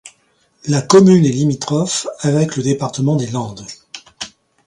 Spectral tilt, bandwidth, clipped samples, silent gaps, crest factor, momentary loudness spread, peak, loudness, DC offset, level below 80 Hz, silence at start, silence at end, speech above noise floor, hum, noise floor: -6 dB/octave; 11.5 kHz; under 0.1%; none; 16 dB; 21 LU; 0 dBFS; -15 LUFS; under 0.1%; -54 dBFS; 0.05 s; 0.4 s; 44 dB; none; -59 dBFS